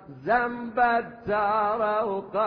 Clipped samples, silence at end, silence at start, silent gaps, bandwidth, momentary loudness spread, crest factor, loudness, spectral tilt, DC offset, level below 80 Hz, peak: under 0.1%; 0 s; 0 s; none; 5.2 kHz; 5 LU; 14 dB; -25 LUFS; -8.5 dB/octave; under 0.1%; -58 dBFS; -12 dBFS